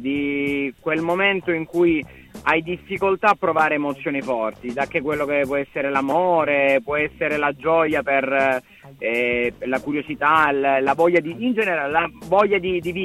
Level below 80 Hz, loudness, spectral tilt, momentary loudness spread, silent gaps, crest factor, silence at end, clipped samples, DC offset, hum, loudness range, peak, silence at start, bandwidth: -52 dBFS; -20 LUFS; -6 dB/octave; 7 LU; none; 16 dB; 0 s; under 0.1%; under 0.1%; none; 2 LU; -4 dBFS; 0 s; 15 kHz